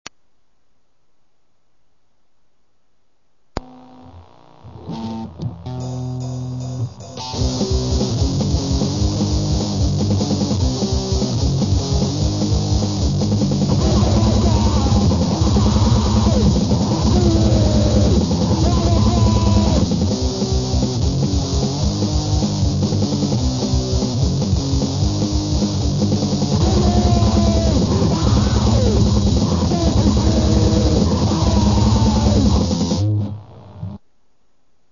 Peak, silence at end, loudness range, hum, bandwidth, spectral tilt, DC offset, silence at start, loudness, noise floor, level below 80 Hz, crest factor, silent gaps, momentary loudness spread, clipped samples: -2 dBFS; 0.95 s; 8 LU; none; 7.4 kHz; -6.5 dB/octave; 0.4%; 3.55 s; -17 LUFS; -67 dBFS; -24 dBFS; 14 dB; none; 11 LU; under 0.1%